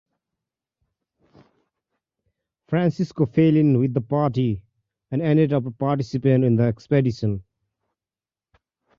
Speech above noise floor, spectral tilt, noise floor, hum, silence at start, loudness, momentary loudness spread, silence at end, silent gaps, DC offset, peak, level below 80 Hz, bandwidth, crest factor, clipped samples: over 70 dB; -9.5 dB/octave; under -90 dBFS; none; 2.7 s; -21 LUFS; 9 LU; 1.55 s; none; under 0.1%; -6 dBFS; -54 dBFS; 7.2 kHz; 18 dB; under 0.1%